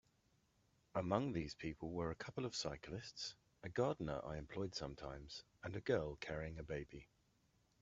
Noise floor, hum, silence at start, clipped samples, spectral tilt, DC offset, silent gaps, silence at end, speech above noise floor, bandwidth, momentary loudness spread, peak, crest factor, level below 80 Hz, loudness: -78 dBFS; none; 0.95 s; under 0.1%; -5 dB/octave; under 0.1%; none; 0.75 s; 34 dB; 8 kHz; 11 LU; -22 dBFS; 24 dB; -64 dBFS; -45 LUFS